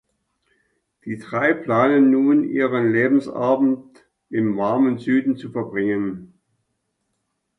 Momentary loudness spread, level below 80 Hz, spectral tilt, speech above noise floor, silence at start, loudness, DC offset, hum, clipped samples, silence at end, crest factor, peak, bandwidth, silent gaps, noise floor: 13 LU; -64 dBFS; -8.5 dB/octave; 55 dB; 1.05 s; -20 LUFS; under 0.1%; none; under 0.1%; 1.35 s; 16 dB; -4 dBFS; 6 kHz; none; -74 dBFS